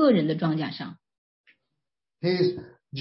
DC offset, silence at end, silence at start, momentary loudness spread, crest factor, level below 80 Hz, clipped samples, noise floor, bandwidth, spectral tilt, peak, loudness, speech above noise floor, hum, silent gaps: under 0.1%; 0 s; 0 s; 17 LU; 18 dB; -68 dBFS; under 0.1%; -86 dBFS; 5.8 kHz; -11 dB/octave; -10 dBFS; -26 LUFS; 61 dB; none; 1.18-1.44 s